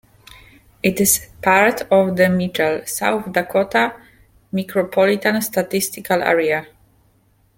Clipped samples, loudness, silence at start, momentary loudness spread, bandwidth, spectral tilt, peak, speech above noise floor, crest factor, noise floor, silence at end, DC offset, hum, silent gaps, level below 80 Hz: under 0.1%; -18 LUFS; 0.85 s; 7 LU; 17 kHz; -4 dB/octave; -2 dBFS; 40 dB; 18 dB; -58 dBFS; 0.9 s; under 0.1%; none; none; -52 dBFS